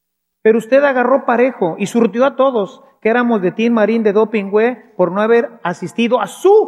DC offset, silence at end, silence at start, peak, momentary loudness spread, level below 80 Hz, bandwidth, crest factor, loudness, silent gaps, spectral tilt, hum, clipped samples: under 0.1%; 0 s; 0.45 s; 0 dBFS; 7 LU; -70 dBFS; 13 kHz; 14 dB; -15 LUFS; none; -6 dB/octave; none; under 0.1%